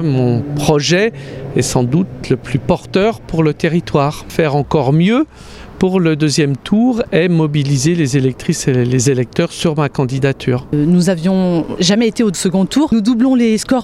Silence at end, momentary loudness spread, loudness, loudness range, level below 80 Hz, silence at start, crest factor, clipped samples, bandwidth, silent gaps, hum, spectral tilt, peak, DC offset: 0 s; 5 LU; -14 LUFS; 2 LU; -40 dBFS; 0 s; 14 dB; under 0.1%; 14 kHz; none; none; -6 dB/octave; 0 dBFS; under 0.1%